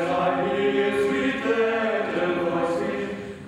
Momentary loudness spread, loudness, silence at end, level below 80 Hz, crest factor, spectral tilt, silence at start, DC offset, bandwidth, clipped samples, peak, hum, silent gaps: 4 LU; -24 LUFS; 0 s; -58 dBFS; 14 dB; -6 dB/octave; 0 s; under 0.1%; 12 kHz; under 0.1%; -10 dBFS; none; none